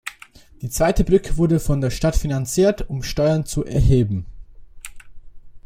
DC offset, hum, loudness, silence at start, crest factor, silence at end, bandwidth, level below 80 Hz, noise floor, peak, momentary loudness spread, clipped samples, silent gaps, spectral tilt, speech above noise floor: under 0.1%; none; -20 LUFS; 0.05 s; 18 dB; 0.05 s; 16.5 kHz; -28 dBFS; -46 dBFS; -2 dBFS; 20 LU; under 0.1%; none; -6.5 dB/octave; 28 dB